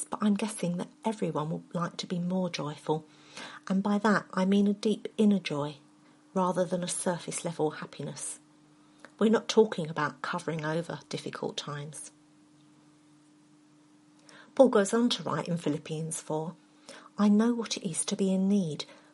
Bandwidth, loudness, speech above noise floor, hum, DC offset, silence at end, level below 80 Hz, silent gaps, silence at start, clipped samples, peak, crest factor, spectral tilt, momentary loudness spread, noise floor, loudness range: 11.5 kHz; -30 LUFS; 31 dB; none; under 0.1%; 0.2 s; -78 dBFS; none; 0 s; under 0.1%; -6 dBFS; 24 dB; -5 dB/octave; 14 LU; -60 dBFS; 7 LU